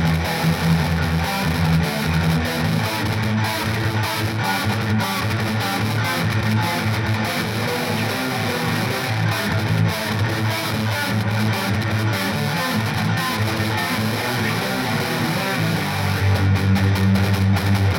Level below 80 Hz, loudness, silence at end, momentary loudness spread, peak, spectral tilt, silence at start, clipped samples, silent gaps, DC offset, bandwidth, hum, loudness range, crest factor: -44 dBFS; -20 LUFS; 0 s; 3 LU; -6 dBFS; -5.5 dB/octave; 0 s; under 0.1%; none; under 0.1%; 17 kHz; none; 1 LU; 14 dB